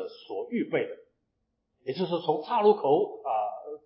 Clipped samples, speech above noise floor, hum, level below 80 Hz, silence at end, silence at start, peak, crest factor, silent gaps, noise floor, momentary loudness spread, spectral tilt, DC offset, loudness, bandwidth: under 0.1%; 52 dB; none; -82 dBFS; 0.1 s; 0 s; -10 dBFS; 20 dB; none; -79 dBFS; 14 LU; -10 dB/octave; under 0.1%; -28 LUFS; 5.6 kHz